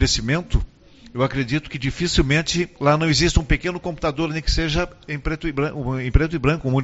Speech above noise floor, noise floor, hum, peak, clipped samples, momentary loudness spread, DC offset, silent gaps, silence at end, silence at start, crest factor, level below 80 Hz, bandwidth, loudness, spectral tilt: 25 dB; -46 dBFS; none; -2 dBFS; under 0.1%; 8 LU; under 0.1%; none; 0 s; 0 s; 20 dB; -28 dBFS; 8 kHz; -21 LUFS; -4.5 dB/octave